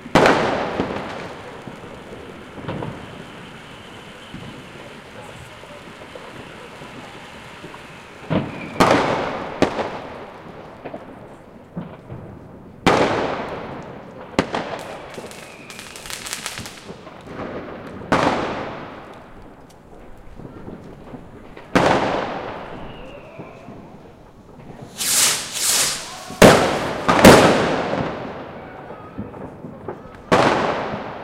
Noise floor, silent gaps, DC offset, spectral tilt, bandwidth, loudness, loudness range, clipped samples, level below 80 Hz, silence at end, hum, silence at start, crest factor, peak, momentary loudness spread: -43 dBFS; none; under 0.1%; -3.5 dB/octave; 16.5 kHz; -19 LUFS; 21 LU; under 0.1%; -44 dBFS; 0 s; none; 0 s; 22 dB; 0 dBFS; 22 LU